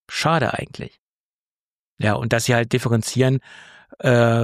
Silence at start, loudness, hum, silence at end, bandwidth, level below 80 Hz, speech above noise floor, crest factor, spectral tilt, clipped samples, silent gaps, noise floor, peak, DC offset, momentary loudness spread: 0.1 s; -20 LUFS; none; 0 s; 15 kHz; -54 dBFS; over 71 dB; 16 dB; -5.5 dB/octave; under 0.1%; 0.99-1.97 s; under -90 dBFS; -4 dBFS; under 0.1%; 12 LU